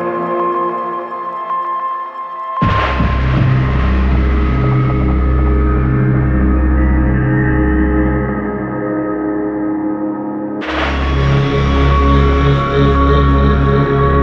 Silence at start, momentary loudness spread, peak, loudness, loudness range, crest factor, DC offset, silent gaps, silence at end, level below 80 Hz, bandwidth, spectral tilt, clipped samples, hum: 0 s; 8 LU; 0 dBFS; -14 LUFS; 5 LU; 12 dB; under 0.1%; none; 0 s; -18 dBFS; 6 kHz; -9 dB/octave; under 0.1%; none